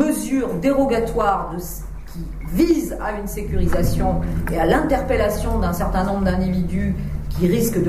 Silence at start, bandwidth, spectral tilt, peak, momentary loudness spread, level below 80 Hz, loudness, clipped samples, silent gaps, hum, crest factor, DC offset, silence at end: 0 s; 15.5 kHz; -6.5 dB/octave; -4 dBFS; 10 LU; -28 dBFS; -21 LUFS; under 0.1%; none; none; 16 dB; under 0.1%; 0 s